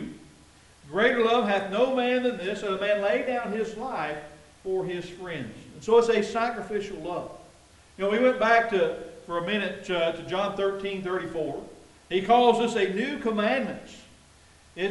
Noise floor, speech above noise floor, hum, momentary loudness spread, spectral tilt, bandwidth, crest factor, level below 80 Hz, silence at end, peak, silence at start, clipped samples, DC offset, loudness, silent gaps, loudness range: -55 dBFS; 29 dB; none; 15 LU; -5 dB/octave; 11.5 kHz; 20 dB; -60 dBFS; 0 s; -6 dBFS; 0 s; under 0.1%; under 0.1%; -26 LUFS; none; 4 LU